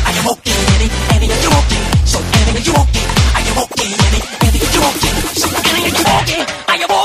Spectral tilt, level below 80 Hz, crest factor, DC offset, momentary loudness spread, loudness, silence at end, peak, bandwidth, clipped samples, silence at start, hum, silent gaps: -3.5 dB/octave; -18 dBFS; 12 dB; under 0.1%; 3 LU; -13 LUFS; 0 s; 0 dBFS; 15.5 kHz; under 0.1%; 0 s; none; none